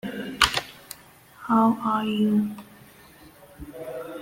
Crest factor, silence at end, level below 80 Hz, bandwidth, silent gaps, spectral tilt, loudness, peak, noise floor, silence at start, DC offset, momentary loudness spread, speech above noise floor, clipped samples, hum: 24 dB; 0 s; -52 dBFS; 16.5 kHz; none; -4 dB/octave; -24 LUFS; -2 dBFS; -51 dBFS; 0.05 s; under 0.1%; 21 LU; 29 dB; under 0.1%; none